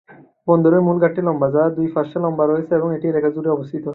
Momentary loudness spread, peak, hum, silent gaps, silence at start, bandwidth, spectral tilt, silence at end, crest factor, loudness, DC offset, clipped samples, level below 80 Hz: 7 LU; -2 dBFS; none; none; 0.1 s; 4.1 kHz; -12 dB/octave; 0 s; 16 dB; -18 LUFS; under 0.1%; under 0.1%; -60 dBFS